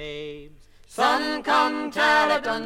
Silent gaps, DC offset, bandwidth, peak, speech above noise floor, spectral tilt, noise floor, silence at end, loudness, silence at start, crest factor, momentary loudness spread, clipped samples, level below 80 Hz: none; under 0.1%; 16 kHz; -6 dBFS; 26 dB; -3 dB/octave; -48 dBFS; 0 s; -21 LUFS; 0 s; 16 dB; 17 LU; under 0.1%; -54 dBFS